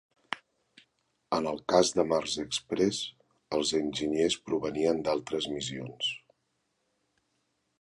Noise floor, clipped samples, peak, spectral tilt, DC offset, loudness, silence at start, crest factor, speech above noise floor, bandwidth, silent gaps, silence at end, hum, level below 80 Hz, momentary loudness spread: -78 dBFS; under 0.1%; -8 dBFS; -3.5 dB/octave; under 0.1%; -30 LUFS; 0.3 s; 22 dB; 48 dB; 11.5 kHz; none; 1.65 s; none; -64 dBFS; 13 LU